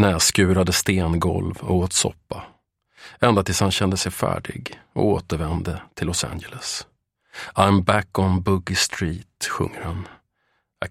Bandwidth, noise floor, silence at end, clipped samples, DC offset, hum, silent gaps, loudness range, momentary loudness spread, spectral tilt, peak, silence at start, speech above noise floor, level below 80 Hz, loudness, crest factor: 16 kHz; -70 dBFS; 0 s; under 0.1%; under 0.1%; none; none; 3 LU; 15 LU; -4.5 dB/octave; 0 dBFS; 0 s; 49 dB; -42 dBFS; -22 LUFS; 22 dB